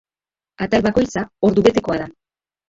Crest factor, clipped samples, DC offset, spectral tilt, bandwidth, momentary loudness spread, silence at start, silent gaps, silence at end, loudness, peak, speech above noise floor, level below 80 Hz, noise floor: 18 dB; under 0.1%; under 0.1%; -6 dB/octave; 7.8 kHz; 11 LU; 0.6 s; none; 0.6 s; -18 LUFS; -2 dBFS; over 73 dB; -44 dBFS; under -90 dBFS